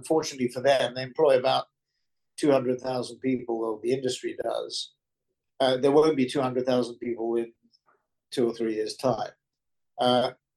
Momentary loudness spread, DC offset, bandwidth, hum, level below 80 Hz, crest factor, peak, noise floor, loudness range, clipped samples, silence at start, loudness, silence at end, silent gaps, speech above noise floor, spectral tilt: 11 LU; under 0.1%; 12.5 kHz; none; -72 dBFS; 18 dB; -10 dBFS; -84 dBFS; 4 LU; under 0.1%; 0 s; -26 LUFS; 0.25 s; none; 58 dB; -5 dB/octave